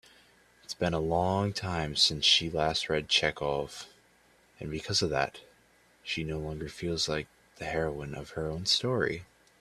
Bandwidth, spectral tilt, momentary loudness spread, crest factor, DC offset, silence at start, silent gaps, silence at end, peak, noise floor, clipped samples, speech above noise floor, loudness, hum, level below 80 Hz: 14 kHz; -3.5 dB/octave; 16 LU; 22 dB; under 0.1%; 0.7 s; none; 0.35 s; -10 dBFS; -64 dBFS; under 0.1%; 33 dB; -29 LUFS; none; -54 dBFS